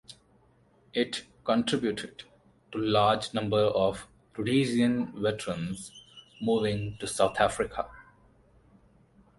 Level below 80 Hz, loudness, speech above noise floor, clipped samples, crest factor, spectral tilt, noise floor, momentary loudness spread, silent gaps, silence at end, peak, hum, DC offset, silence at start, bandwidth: -58 dBFS; -29 LUFS; 35 dB; under 0.1%; 22 dB; -5 dB/octave; -63 dBFS; 15 LU; none; 1.35 s; -8 dBFS; none; under 0.1%; 0.1 s; 11.5 kHz